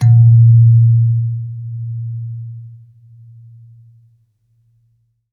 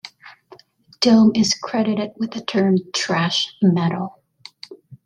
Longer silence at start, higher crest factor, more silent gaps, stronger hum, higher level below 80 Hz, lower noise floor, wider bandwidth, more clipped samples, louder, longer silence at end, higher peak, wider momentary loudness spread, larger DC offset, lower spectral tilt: about the same, 0 s vs 0.05 s; second, 12 dB vs 18 dB; neither; neither; about the same, -58 dBFS vs -62 dBFS; first, -60 dBFS vs -49 dBFS; second, 0.8 kHz vs 10 kHz; neither; first, -12 LUFS vs -19 LUFS; first, 2.6 s vs 0.1 s; about the same, -2 dBFS vs -2 dBFS; second, 21 LU vs 25 LU; neither; first, -10 dB/octave vs -5 dB/octave